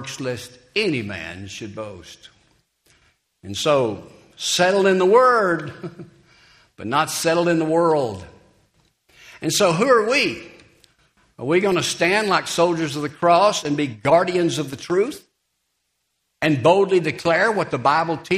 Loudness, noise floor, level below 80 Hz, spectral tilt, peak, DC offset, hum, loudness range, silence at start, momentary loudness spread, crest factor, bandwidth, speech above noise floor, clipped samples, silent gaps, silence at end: -19 LUFS; -73 dBFS; -60 dBFS; -4 dB/octave; -2 dBFS; under 0.1%; none; 7 LU; 0 s; 17 LU; 18 dB; 15.5 kHz; 54 dB; under 0.1%; none; 0 s